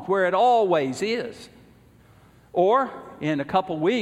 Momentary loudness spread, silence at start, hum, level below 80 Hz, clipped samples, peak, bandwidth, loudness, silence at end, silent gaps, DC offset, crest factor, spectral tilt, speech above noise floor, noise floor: 12 LU; 0 s; none; -62 dBFS; under 0.1%; -8 dBFS; 12.5 kHz; -23 LUFS; 0 s; none; under 0.1%; 16 dB; -5.5 dB/octave; 31 dB; -53 dBFS